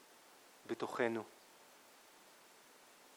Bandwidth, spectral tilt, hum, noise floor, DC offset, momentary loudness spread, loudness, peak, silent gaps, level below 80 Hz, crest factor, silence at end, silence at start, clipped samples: over 20 kHz; -4.5 dB/octave; none; -63 dBFS; under 0.1%; 23 LU; -41 LUFS; -22 dBFS; none; under -90 dBFS; 24 dB; 0 s; 0.1 s; under 0.1%